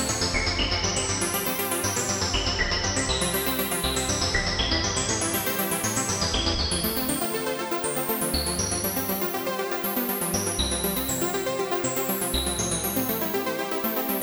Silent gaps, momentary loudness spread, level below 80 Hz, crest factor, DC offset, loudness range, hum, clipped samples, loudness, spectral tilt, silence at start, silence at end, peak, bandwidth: none; 3 LU; -38 dBFS; 16 dB; under 0.1%; 2 LU; none; under 0.1%; -25 LUFS; -2.5 dB/octave; 0 s; 0 s; -10 dBFS; over 20 kHz